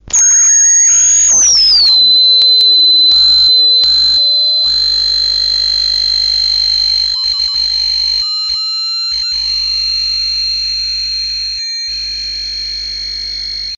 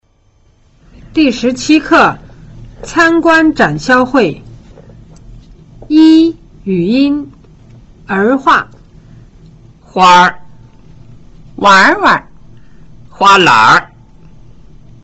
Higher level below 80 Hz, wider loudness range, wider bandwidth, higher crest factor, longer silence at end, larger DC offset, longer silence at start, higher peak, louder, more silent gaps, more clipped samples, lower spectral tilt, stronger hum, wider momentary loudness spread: about the same, -38 dBFS vs -40 dBFS; first, 9 LU vs 4 LU; first, 9.4 kHz vs 8.2 kHz; about the same, 10 dB vs 12 dB; second, 0 s vs 1.2 s; neither; second, 0.05 s vs 1.15 s; about the same, -2 dBFS vs 0 dBFS; about the same, -8 LUFS vs -9 LUFS; neither; neither; second, 3 dB/octave vs -4.5 dB/octave; neither; about the same, 12 LU vs 13 LU